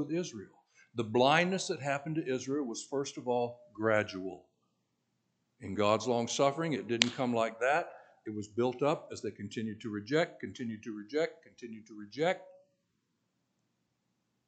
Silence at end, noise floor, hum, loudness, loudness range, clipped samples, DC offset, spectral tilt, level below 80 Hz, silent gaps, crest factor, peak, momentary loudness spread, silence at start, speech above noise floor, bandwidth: 1.95 s; -80 dBFS; none; -33 LUFS; 7 LU; under 0.1%; under 0.1%; -4.5 dB/octave; -82 dBFS; none; 34 dB; -2 dBFS; 15 LU; 0 s; 47 dB; 9 kHz